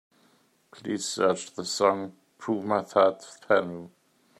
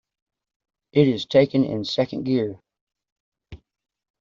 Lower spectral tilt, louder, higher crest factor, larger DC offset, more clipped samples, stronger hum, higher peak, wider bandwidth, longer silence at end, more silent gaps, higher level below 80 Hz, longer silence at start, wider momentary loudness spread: second, -4 dB/octave vs -6 dB/octave; second, -27 LUFS vs -22 LUFS; about the same, 22 dB vs 20 dB; neither; neither; neither; about the same, -6 dBFS vs -4 dBFS; first, 14 kHz vs 7.4 kHz; about the same, 0.55 s vs 0.65 s; second, none vs 2.81-2.87 s, 3.12-3.32 s; second, -76 dBFS vs -58 dBFS; second, 0.75 s vs 0.95 s; first, 17 LU vs 6 LU